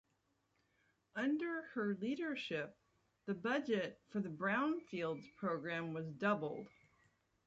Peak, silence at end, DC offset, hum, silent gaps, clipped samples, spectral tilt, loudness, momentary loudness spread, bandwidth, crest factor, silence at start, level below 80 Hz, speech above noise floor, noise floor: -24 dBFS; 0.8 s; under 0.1%; none; none; under 0.1%; -6.5 dB/octave; -41 LUFS; 9 LU; 7.8 kHz; 18 dB; 1.15 s; -82 dBFS; 41 dB; -82 dBFS